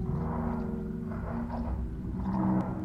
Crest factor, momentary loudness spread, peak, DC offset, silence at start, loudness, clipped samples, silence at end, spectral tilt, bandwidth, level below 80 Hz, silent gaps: 14 dB; 7 LU; -18 dBFS; under 0.1%; 0 s; -33 LUFS; under 0.1%; 0 s; -10.5 dB/octave; 5.6 kHz; -40 dBFS; none